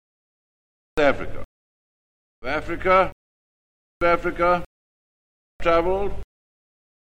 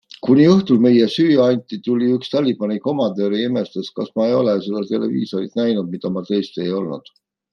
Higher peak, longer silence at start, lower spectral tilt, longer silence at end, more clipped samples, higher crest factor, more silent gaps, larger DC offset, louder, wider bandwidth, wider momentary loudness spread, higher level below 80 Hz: about the same, -4 dBFS vs -2 dBFS; first, 0.95 s vs 0.25 s; about the same, -6.5 dB/octave vs -7.5 dB/octave; first, 0.9 s vs 0.55 s; neither; first, 22 dB vs 16 dB; first, 1.45-2.42 s, 3.12-4.01 s, 4.66-5.60 s vs none; neither; second, -22 LUFS vs -18 LUFS; first, 9.4 kHz vs 6.8 kHz; first, 14 LU vs 11 LU; first, -40 dBFS vs -62 dBFS